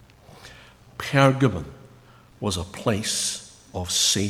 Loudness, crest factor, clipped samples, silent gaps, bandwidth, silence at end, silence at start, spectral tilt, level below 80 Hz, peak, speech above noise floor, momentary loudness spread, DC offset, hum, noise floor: -23 LUFS; 24 dB; under 0.1%; none; 16 kHz; 0 s; 0.4 s; -3.5 dB/octave; -50 dBFS; -2 dBFS; 28 dB; 22 LU; under 0.1%; none; -51 dBFS